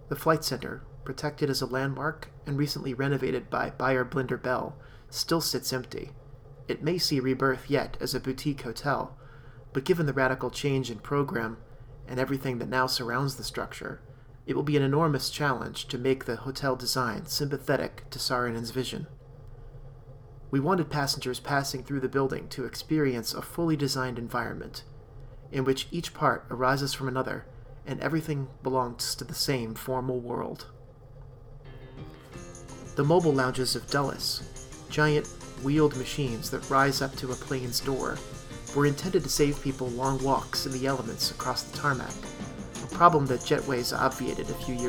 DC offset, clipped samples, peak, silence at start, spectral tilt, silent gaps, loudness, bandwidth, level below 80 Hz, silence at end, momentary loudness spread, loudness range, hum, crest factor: under 0.1%; under 0.1%; -4 dBFS; 0 s; -4.5 dB/octave; none; -29 LUFS; over 20 kHz; -48 dBFS; 0 s; 16 LU; 4 LU; none; 26 dB